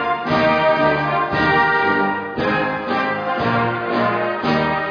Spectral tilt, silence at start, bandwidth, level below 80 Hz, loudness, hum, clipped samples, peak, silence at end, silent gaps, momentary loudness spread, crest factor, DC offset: -7 dB/octave; 0 s; 5.4 kHz; -46 dBFS; -18 LUFS; none; under 0.1%; -4 dBFS; 0 s; none; 5 LU; 14 dB; under 0.1%